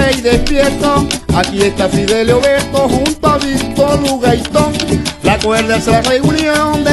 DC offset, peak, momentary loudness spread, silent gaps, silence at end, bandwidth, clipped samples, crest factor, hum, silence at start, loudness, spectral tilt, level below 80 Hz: under 0.1%; 0 dBFS; 3 LU; none; 0 s; 12.5 kHz; under 0.1%; 12 dB; none; 0 s; -12 LUFS; -4.5 dB/octave; -26 dBFS